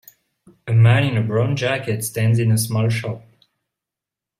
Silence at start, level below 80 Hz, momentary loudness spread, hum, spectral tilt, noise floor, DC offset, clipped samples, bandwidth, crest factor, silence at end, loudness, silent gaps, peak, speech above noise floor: 0.65 s; -54 dBFS; 12 LU; none; -6 dB/octave; -87 dBFS; under 0.1%; under 0.1%; 15.5 kHz; 18 dB; 1.2 s; -19 LUFS; none; -2 dBFS; 69 dB